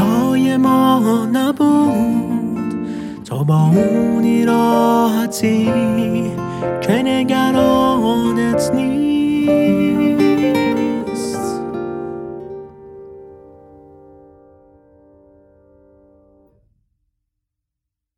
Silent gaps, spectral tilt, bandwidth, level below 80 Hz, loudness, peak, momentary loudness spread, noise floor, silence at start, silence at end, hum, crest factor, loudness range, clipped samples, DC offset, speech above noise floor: none; -6.5 dB/octave; 16 kHz; -48 dBFS; -16 LUFS; -2 dBFS; 12 LU; -82 dBFS; 0 s; 4.8 s; none; 16 dB; 12 LU; under 0.1%; under 0.1%; 67 dB